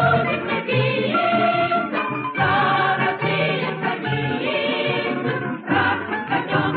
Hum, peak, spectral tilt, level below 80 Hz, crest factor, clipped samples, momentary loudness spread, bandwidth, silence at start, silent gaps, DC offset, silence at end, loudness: none; -6 dBFS; -10.5 dB/octave; -60 dBFS; 14 dB; under 0.1%; 5 LU; 4.9 kHz; 0 s; none; under 0.1%; 0 s; -21 LUFS